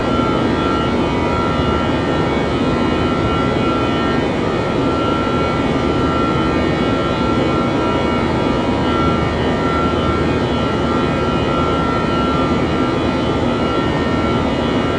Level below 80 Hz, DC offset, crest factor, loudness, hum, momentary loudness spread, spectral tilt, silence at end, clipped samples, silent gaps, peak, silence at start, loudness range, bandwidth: -32 dBFS; under 0.1%; 12 dB; -16 LUFS; none; 1 LU; -6.5 dB/octave; 0 s; under 0.1%; none; -4 dBFS; 0 s; 0 LU; 10 kHz